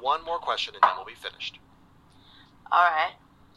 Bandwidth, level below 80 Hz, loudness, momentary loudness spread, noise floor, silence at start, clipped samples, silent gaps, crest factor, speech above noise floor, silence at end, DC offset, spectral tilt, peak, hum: 12.5 kHz; -64 dBFS; -26 LUFS; 15 LU; -56 dBFS; 0 s; under 0.1%; none; 24 dB; 30 dB; 0.45 s; under 0.1%; -2 dB/octave; -4 dBFS; none